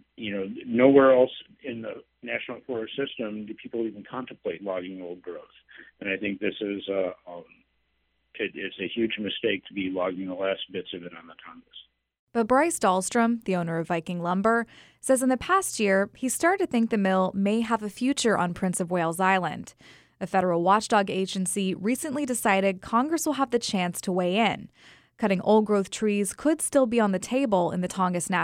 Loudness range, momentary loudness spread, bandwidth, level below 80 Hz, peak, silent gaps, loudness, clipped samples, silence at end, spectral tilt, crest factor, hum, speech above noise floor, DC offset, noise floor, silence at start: 9 LU; 15 LU; 16 kHz; -62 dBFS; -4 dBFS; 12.19-12.27 s; -26 LUFS; under 0.1%; 0 s; -4.5 dB/octave; 22 dB; none; 47 dB; under 0.1%; -73 dBFS; 0.2 s